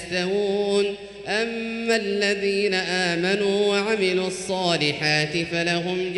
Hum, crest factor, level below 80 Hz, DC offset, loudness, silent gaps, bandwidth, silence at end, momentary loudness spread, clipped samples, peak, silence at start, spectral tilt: none; 16 dB; -58 dBFS; under 0.1%; -22 LUFS; none; 11.5 kHz; 0 s; 5 LU; under 0.1%; -6 dBFS; 0 s; -4 dB/octave